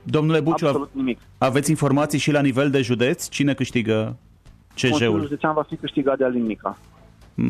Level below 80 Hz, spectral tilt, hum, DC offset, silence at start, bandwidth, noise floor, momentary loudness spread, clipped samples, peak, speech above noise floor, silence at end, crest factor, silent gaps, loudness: -52 dBFS; -5.5 dB/octave; none; under 0.1%; 0.05 s; 14 kHz; -49 dBFS; 9 LU; under 0.1%; -8 dBFS; 29 dB; 0 s; 14 dB; none; -21 LUFS